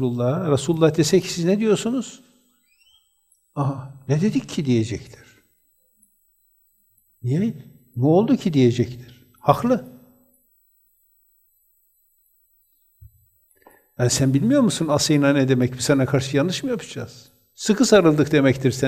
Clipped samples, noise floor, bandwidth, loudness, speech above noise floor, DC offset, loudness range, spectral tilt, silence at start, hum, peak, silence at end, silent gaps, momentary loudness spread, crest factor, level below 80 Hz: under 0.1%; -64 dBFS; 16 kHz; -20 LUFS; 45 dB; under 0.1%; 8 LU; -5.5 dB/octave; 0 s; none; 0 dBFS; 0 s; none; 12 LU; 22 dB; -56 dBFS